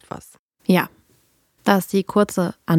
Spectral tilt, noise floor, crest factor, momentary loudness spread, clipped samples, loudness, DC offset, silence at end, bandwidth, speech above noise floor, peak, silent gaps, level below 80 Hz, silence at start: -6 dB/octave; -61 dBFS; 20 dB; 13 LU; under 0.1%; -21 LUFS; under 0.1%; 0 s; 16.5 kHz; 42 dB; -2 dBFS; 0.39-0.49 s; -60 dBFS; 0.15 s